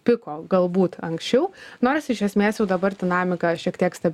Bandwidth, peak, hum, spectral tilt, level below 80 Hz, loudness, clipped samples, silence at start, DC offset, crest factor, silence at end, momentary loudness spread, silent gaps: 14 kHz; -6 dBFS; none; -6.5 dB/octave; -60 dBFS; -23 LUFS; under 0.1%; 0.05 s; under 0.1%; 16 dB; 0 s; 3 LU; none